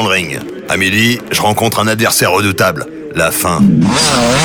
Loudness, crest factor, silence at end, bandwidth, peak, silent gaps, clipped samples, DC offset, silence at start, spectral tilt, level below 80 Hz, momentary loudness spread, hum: -11 LUFS; 10 dB; 0 s; over 20 kHz; -2 dBFS; none; under 0.1%; under 0.1%; 0 s; -3.5 dB/octave; -40 dBFS; 8 LU; none